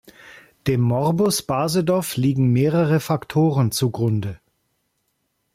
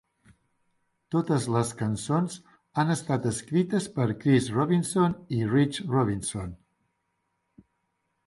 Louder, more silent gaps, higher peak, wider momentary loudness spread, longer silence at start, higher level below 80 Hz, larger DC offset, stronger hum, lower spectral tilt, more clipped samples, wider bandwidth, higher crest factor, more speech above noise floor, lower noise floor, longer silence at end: first, -20 LUFS vs -27 LUFS; neither; about the same, -8 dBFS vs -10 dBFS; second, 5 LU vs 8 LU; second, 0.25 s vs 1.1 s; about the same, -54 dBFS vs -56 dBFS; neither; neither; about the same, -6 dB/octave vs -6 dB/octave; neither; first, 16 kHz vs 11.5 kHz; second, 12 dB vs 18 dB; about the same, 52 dB vs 51 dB; second, -72 dBFS vs -77 dBFS; second, 1.2 s vs 1.7 s